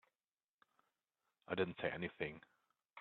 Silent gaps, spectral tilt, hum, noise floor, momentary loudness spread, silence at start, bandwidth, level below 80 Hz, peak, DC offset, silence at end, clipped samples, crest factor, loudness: none; -4 dB/octave; none; under -90 dBFS; 17 LU; 1.5 s; 4.4 kHz; -76 dBFS; -24 dBFS; under 0.1%; 0 s; under 0.1%; 24 dB; -43 LUFS